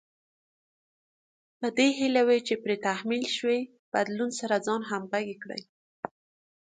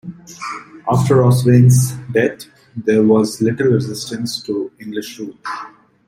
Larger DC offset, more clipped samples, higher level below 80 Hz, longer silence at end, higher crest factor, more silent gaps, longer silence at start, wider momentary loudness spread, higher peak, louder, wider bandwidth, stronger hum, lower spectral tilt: neither; neither; second, -78 dBFS vs -52 dBFS; first, 0.6 s vs 0.4 s; first, 20 dB vs 14 dB; first, 3.79-3.92 s, 5.69-6.03 s vs none; first, 1.6 s vs 0.05 s; about the same, 16 LU vs 18 LU; second, -10 dBFS vs -2 dBFS; second, -28 LUFS vs -16 LUFS; second, 9.4 kHz vs 16 kHz; neither; second, -3.5 dB/octave vs -6.5 dB/octave